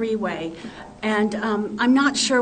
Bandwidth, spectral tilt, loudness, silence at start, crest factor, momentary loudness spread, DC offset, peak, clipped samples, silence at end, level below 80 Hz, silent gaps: 9.4 kHz; -3.5 dB/octave; -22 LUFS; 0 s; 16 dB; 15 LU; under 0.1%; -6 dBFS; under 0.1%; 0 s; -56 dBFS; none